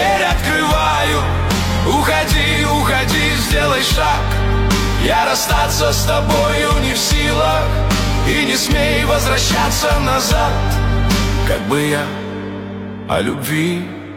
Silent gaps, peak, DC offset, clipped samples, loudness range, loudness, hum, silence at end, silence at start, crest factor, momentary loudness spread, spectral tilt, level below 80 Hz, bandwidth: none; -2 dBFS; under 0.1%; under 0.1%; 3 LU; -15 LUFS; none; 0 s; 0 s; 12 dB; 4 LU; -4 dB/octave; -22 dBFS; 17.5 kHz